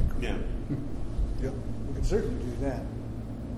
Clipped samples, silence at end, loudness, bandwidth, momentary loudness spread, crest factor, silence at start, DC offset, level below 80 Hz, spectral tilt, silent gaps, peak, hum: under 0.1%; 0 s; -34 LUFS; 12 kHz; 7 LU; 16 dB; 0 s; under 0.1%; -32 dBFS; -7.5 dB/octave; none; -14 dBFS; none